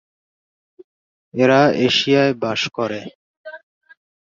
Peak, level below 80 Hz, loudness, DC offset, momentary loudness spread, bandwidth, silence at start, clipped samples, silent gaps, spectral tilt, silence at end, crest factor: -2 dBFS; -62 dBFS; -17 LUFS; under 0.1%; 24 LU; 7.6 kHz; 1.35 s; under 0.1%; 3.15-3.44 s; -5 dB/octave; 0.8 s; 18 dB